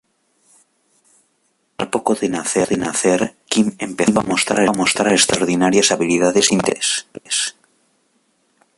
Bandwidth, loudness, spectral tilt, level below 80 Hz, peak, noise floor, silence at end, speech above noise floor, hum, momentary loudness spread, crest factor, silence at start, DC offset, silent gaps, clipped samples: 11.5 kHz; -17 LUFS; -3 dB/octave; -54 dBFS; 0 dBFS; -65 dBFS; 1.25 s; 49 dB; none; 7 LU; 18 dB; 1.8 s; under 0.1%; none; under 0.1%